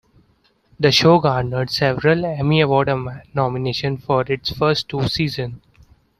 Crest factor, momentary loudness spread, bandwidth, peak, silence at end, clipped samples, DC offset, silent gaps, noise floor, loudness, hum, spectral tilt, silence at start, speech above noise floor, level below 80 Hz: 18 dB; 9 LU; 14 kHz; -2 dBFS; 0.6 s; under 0.1%; under 0.1%; none; -60 dBFS; -18 LUFS; none; -6 dB/octave; 0.8 s; 42 dB; -46 dBFS